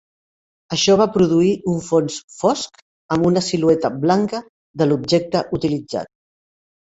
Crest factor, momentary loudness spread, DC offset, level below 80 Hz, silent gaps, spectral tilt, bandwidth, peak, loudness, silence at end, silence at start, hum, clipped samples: 18 dB; 12 LU; under 0.1%; -54 dBFS; 2.24-2.28 s, 2.82-3.09 s, 4.49-4.74 s; -5.5 dB/octave; 8.2 kHz; -2 dBFS; -18 LUFS; 0.8 s; 0.7 s; none; under 0.1%